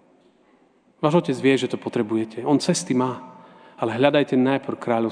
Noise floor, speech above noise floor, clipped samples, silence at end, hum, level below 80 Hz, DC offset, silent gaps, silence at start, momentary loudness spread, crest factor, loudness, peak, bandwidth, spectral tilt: -58 dBFS; 37 dB; under 0.1%; 0 s; none; -72 dBFS; under 0.1%; none; 1 s; 7 LU; 22 dB; -22 LUFS; -2 dBFS; 10 kHz; -5.5 dB/octave